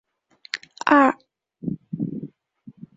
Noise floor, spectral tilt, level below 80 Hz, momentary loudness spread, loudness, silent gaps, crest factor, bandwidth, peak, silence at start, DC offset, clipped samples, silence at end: -54 dBFS; -6 dB/octave; -66 dBFS; 19 LU; -22 LUFS; none; 22 dB; 7.8 kHz; -2 dBFS; 0.55 s; under 0.1%; under 0.1%; 0.25 s